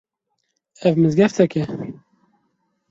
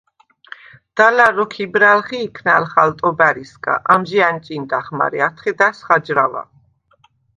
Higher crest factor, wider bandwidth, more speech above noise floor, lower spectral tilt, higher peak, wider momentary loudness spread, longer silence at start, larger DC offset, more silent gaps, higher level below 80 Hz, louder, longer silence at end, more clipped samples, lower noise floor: about the same, 18 dB vs 16 dB; second, 7.8 kHz vs 11 kHz; first, 57 dB vs 41 dB; first, -7.5 dB/octave vs -5.5 dB/octave; about the same, -2 dBFS vs 0 dBFS; first, 14 LU vs 10 LU; second, 0.8 s vs 0.95 s; neither; neither; about the same, -58 dBFS vs -60 dBFS; second, -18 LUFS vs -15 LUFS; about the same, 1 s vs 0.95 s; neither; first, -74 dBFS vs -57 dBFS